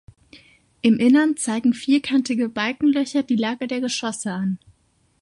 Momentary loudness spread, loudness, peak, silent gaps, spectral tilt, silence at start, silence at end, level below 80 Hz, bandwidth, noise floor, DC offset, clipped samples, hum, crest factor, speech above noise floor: 9 LU; -21 LUFS; -4 dBFS; none; -4.5 dB/octave; 0.35 s; 0.65 s; -62 dBFS; 11.5 kHz; -63 dBFS; under 0.1%; under 0.1%; none; 16 dB; 43 dB